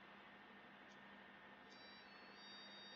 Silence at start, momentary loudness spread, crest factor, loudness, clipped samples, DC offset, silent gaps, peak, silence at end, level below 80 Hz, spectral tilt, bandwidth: 0 s; 5 LU; 14 dB; -60 LUFS; under 0.1%; under 0.1%; none; -48 dBFS; 0 s; under -90 dBFS; -1 dB/octave; 7 kHz